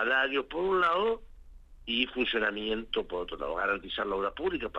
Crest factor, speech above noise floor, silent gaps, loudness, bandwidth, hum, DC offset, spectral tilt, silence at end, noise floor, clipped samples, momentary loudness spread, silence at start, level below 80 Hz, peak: 20 dB; 20 dB; none; -30 LUFS; 7.8 kHz; none; under 0.1%; -5.5 dB/octave; 0 s; -50 dBFS; under 0.1%; 9 LU; 0 s; -52 dBFS; -12 dBFS